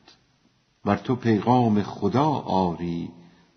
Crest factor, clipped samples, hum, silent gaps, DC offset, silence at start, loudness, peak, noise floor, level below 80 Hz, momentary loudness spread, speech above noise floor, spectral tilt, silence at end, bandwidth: 20 dB; under 0.1%; none; none; under 0.1%; 0.85 s; -24 LUFS; -4 dBFS; -65 dBFS; -58 dBFS; 11 LU; 42 dB; -7 dB/octave; 0.45 s; 6.4 kHz